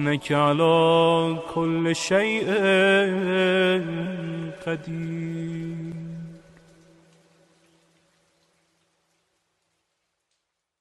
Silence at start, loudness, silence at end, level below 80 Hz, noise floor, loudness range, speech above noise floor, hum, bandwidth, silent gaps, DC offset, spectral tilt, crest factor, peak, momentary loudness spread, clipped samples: 0 s; -22 LUFS; 4.45 s; -62 dBFS; -78 dBFS; 17 LU; 56 dB; none; 12 kHz; none; under 0.1%; -5.5 dB/octave; 18 dB; -8 dBFS; 15 LU; under 0.1%